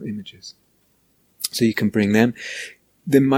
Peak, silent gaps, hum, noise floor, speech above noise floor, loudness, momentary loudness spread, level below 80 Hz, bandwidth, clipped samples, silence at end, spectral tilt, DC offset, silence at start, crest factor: -2 dBFS; none; none; -63 dBFS; 43 dB; -21 LUFS; 20 LU; -60 dBFS; 17 kHz; under 0.1%; 0 s; -5.5 dB/octave; under 0.1%; 0 s; 20 dB